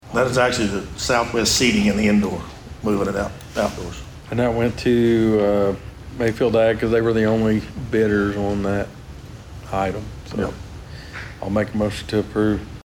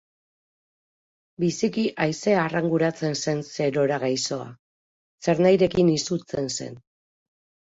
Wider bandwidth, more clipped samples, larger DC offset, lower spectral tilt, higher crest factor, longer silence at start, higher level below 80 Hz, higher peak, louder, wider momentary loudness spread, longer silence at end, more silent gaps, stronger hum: first, 19.5 kHz vs 8 kHz; neither; neither; about the same, -5 dB/octave vs -5 dB/octave; about the same, 16 dB vs 18 dB; second, 0.05 s vs 1.4 s; first, -40 dBFS vs -60 dBFS; about the same, -6 dBFS vs -6 dBFS; first, -20 LUFS vs -24 LUFS; first, 17 LU vs 10 LU; second, 0 s vs 0.95 s; second, none vs 4.59-5.18 s; neither